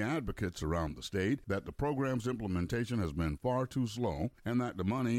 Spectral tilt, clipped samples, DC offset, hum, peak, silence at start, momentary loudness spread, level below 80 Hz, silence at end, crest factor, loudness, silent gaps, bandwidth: -6.5 dB/octave; under 0.1%; under 0.1%; none; -22 dBFS; 0 s; 3 LU; -50 dBFS; 0 s; 14 dB; -35 LUFS; none; 16 kHz